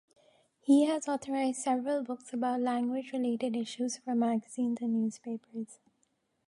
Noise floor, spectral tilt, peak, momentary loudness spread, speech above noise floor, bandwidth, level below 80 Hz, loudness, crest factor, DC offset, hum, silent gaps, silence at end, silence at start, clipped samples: -76 dBFS; -4.5 dB/octave; -14 dBFS; 14 LU; 45 dB; 11.5 kHz; -84 dBFS; -32 LUFS; 18 dB; under 0.1%; none; none; 0.75 s; 0.65 s; under 0.1%